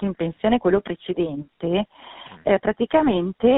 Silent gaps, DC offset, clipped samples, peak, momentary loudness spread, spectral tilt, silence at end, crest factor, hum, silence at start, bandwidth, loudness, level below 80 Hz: none; under 0.1%; under 0.1%; -4 dBFS; 10 LU; -5 dB/octave; 0 s; 18 dB; none; 0 s; 4 kHz; -22 LUFS; -50 dBFS